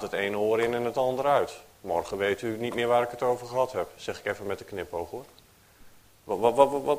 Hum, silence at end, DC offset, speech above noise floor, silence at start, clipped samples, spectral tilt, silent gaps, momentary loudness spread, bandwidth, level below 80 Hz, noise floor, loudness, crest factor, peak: none; 0 s; under 0.1%; 27 dB; 0 s; under 0.1%; -5 dB/octave; none; 11 LU; 15.5 kHz; -60 dBFS; -54 dBFS; -28 LUFS; 24 dB; -4 dBFS